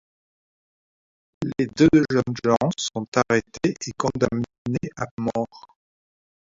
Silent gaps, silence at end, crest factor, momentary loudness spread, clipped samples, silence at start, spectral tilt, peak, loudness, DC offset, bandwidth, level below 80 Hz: 3.08-3.12 s, 4.58-4.65 s, 5.11-5.17 s; 0.9 s; 20 dB; 12 LU; under 0.1%; 1.4 s; -5.5 dB/octave; -4 dBFS; -23 LUFS; under 0.1%; 7.8 kHz; -52 dBFS